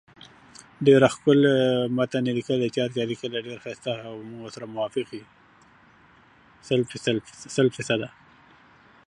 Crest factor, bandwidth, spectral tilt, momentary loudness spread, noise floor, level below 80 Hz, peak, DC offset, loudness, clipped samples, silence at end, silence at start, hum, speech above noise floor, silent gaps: 22 dB; 11 kHz; -6 dB/octave; 18 LU; -55 dBFS; -66 dBFS; -4 dBFS; under 0.1%; -24 LUFS; under 0.1%; 1 s; 0.8 s; none; 32 dB; none